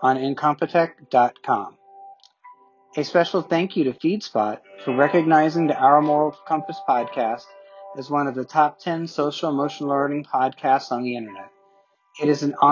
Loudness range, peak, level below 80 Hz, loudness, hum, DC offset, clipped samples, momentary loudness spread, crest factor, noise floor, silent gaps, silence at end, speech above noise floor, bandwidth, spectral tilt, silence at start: 5 LU; -2 dBFS; -74 dBFS; -22 LUFS; none; under 0.1%; under 0.1%; 11 LU; 20 dB; -60 dBFS; none; 0 s; 39 dB; 7.4 kHz; -6.5 dB/octave; 0 s